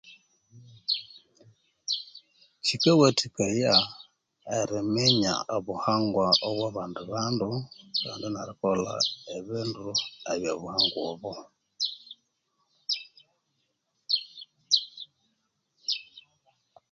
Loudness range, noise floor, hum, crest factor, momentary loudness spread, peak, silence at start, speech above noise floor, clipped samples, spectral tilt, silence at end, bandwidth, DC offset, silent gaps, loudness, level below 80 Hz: 7 LU; -77 dBFS; none; 24 dB; 18 LU; -6 dBFS; 0.05 s; 49 dB; under 0.1%; -4 dB/octave; 0.7 s; 9.4 kHz; under 0.1%; none; -27 LUFS; -66 dBFS